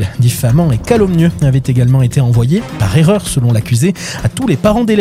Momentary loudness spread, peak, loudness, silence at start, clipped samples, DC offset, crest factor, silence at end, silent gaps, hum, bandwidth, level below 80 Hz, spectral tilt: 4 LU; 0 dBFS; -12 LUFS; 0 s; under 0.1%; under 0.1%; 10 dB; 0 s; none; none; 15.5 kHz; -30 dBFS; -6.5 dB/octave